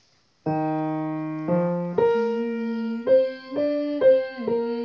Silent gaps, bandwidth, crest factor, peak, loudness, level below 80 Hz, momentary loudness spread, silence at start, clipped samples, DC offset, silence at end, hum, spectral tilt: none; 6 kHz; 14 dB; -8 dBFS; -24 LUFS; -64 dBFS; 9 LU; 0.45 s; under 0.1%; under 0.1%; 0 s; none; -9 dB/octave